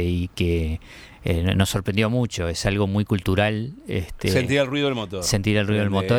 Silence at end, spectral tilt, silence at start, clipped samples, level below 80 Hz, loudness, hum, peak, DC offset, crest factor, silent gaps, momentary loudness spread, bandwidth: 0 s; -5.5 dB/octave; 0 s; under 0.1%; -38 dBFS; -23 LUFS; none; -6 dBFS; under 0.1%; 16 dB; none; 9 LU; 17 kHz